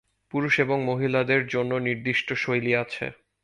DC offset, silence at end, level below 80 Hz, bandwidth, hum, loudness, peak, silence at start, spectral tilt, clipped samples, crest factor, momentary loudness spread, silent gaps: under 0.1%; 0.3 s; -62 dBFS; 11.5 kHz; none; -25 LUFS; -6 dBFS; 0.35 s; -6.5 dB/octave; under 0.1%; 20 dB; 10 LU; none